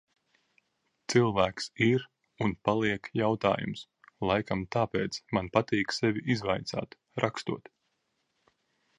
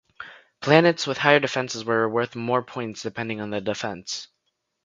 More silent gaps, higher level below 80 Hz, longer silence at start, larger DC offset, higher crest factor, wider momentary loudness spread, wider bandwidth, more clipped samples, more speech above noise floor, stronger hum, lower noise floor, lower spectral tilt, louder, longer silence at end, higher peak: neither; first, -58 dBFS vs -64 dBFS; first, 1.1 s vs 0.2 s; neither; about the same, 24 dB vs 24 dB; second, 10 LU vs 15 LU; first, 11 kHz vs 9.4 kHz; neither; second, 49 dB vs 53 dB; neither; about the same, -78 dBFS vs -76 dBFS; about the same, -5.5 dB/octave vs -4.5 dB/octave; second, -30 LUFS vs -23 LUFS; first, 1.4 s vs 0.6 s; second, -8 dBFS vs 0 dBFS